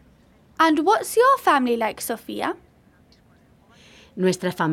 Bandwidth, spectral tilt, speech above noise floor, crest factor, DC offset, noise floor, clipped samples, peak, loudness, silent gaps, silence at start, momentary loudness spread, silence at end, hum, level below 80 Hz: 17 kHz; -4.5 dB/octave; 35 dB; 18 dB; under 0.1%; -55 dBFS; under 0.1%; -6 dBFS; -21 LUFS; none; 0.6 s; 12 LU; 0 s; none; -62 dBFS